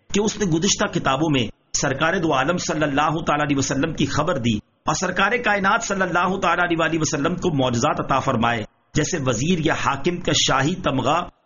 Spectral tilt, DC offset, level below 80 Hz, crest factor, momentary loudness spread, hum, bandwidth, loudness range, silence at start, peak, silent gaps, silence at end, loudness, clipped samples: -3.5 dB/octave; under 0.1%; -42 dBFS; 16 dB; 4 LU; none; 7.4 kHz; 1 LU; 0.1 s; -6 dBFS; none; 0.15 s; -21 LUFS; under 0.1%